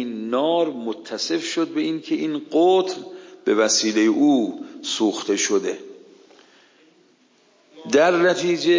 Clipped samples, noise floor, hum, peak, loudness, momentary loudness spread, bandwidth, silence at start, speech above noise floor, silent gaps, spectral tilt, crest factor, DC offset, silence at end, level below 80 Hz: under 0.1%; -58 dBFS; none; -6 dBFS; -21 LUFS; 12 LU; 7.6 kHz; 0 s; 38 dB; none; -3 dB/octave; 16 dB; under 0.1%; 0 s; -76 dBFS